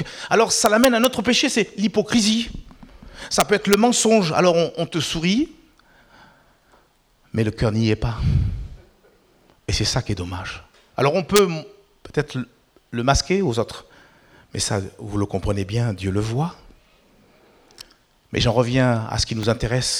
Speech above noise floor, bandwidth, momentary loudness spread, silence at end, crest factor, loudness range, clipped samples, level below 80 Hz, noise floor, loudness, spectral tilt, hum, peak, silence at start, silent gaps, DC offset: 39 dB; over 20 kHz; 15 LU; 0 s; 18 dB; 7 LU; under 0.1%; -38 dBFS; -59 dBFS; -20 LUFS; -4.5 dB/octave; none; -2 dBFS; 0 s; none; under 0.1%